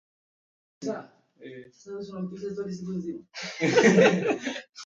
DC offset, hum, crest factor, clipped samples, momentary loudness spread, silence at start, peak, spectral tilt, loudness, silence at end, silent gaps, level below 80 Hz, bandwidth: under 0.1%; none; 22 dB; under 0.1%; 23 LU; 0.8 s; -4 dBFS; -5 dB/octave; -26 LUFS; 0 s; none; -68 dBFS; 8.6 kHz